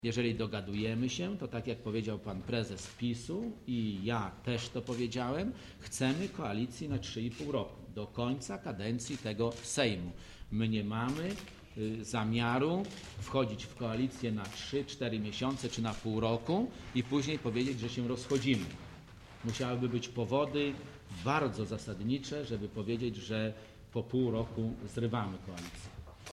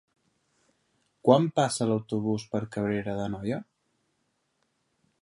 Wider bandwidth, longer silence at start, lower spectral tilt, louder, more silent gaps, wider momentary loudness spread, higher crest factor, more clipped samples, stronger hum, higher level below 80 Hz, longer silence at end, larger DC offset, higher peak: first, 13 kHz vs 11.5 kHz; second, 0 s vs 1.25 s; about the same, -5.5 dB/octave vs -6 dB/octave; second, -36 LUFS vs -28 LUFS; neither; about the same, 10 LU vs 11 LU; second, 20 dB vs 26 dB; neither; neither; about the same, -58 dBFS vs -62 dBFS; second, 0 s vs 1.6 s; neither; second, -16 dBFS vs -4 dBFS